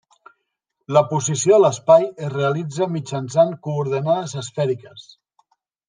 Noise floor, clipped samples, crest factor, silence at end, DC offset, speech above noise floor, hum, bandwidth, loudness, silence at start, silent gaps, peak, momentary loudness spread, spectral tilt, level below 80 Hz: -76 dBFS; under 0.1%; 18 dB; 0.9 s; under 0.1%; 57 dB; none; 10 kHz; -19 LUFS; 0.9 s; none; -2 dBFS; 10 LU; -5.5 dB/octave; -68 dBFS